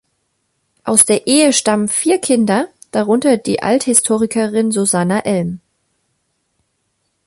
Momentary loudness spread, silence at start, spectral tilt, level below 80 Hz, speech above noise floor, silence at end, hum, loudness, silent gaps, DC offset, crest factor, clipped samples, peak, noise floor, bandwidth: 9 LU; 0.85 s; -3.5 dB/octave; -56 dBFS; 53 dB; 1.7 s; none; -14 LUFS; none; under 0.1%; 16 dB; under 0.1%; 0 dBFS; -67 dBFS; 16 kHz